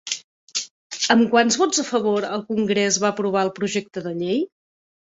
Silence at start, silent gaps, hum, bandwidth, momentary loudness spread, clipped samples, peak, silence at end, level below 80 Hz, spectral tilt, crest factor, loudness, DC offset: 0.05 s; 0.24-0.47 s, 0.71-0.90 s; none; 8 kHz; 12 LU; under 0.1%; -2 dBFS; 0.6 s; -66 dBFS; -3 dB/octave; 20 dB; -21 LUFS; under 0.1%